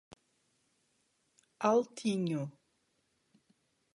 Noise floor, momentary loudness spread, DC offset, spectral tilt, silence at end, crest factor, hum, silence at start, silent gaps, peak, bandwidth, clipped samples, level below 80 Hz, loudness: -77 dBFS; 9 LU; under 0.1%; -6 dB/octave; 1.45 s; 22 dB; none; 1.6 s; none; -16 dBFS; 11.5 kHz; under 0.1%; -80 dBFS; -33 LUFS